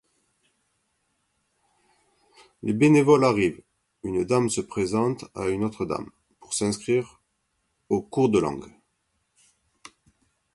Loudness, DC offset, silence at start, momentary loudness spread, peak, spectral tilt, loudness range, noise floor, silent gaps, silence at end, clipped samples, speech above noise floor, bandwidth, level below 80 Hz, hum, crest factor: -24 LUFS; under 0.1%; 2.65 s; 14 LU; -6 dBFS; -6 dB/octave; 6 LU; -74 dBFS; none; 1.9 s; under 0.1%; 51 dB; 11.5 kHz; -58 dBFS; none; 20 dB